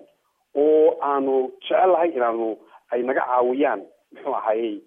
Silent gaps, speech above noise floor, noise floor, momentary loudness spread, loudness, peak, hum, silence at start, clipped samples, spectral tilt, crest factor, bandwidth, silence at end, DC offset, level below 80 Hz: none; 42 dB; -63 dBFS; 11 LU; -21 LUFS; -8 dBFS; none; 0.55 s; under 0.1%; -7.5 dB/octave; 14 dB; 3.7 kHz; 0.05 s; under 0.1%; -82 dBFS